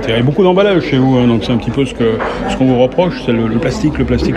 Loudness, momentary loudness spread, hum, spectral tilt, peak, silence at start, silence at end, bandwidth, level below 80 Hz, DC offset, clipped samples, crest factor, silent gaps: -13 LUFS; 5 LU; none; -7 dB/octave; 0 dBFS; 0 s; 0 s; 10 kHz; -30 dBFS; under 0.1%; under 0.1%; 12 dB; none